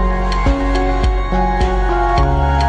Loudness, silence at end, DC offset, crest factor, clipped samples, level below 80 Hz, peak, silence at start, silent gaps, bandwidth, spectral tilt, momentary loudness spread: -16 LUFS; 0 s; under 0.1%; 10 dB; under 0.1%; -16 dBFS; -2 dBFS; 0 s; none; 8.6 kHz; -7 dB/octave; 3 LU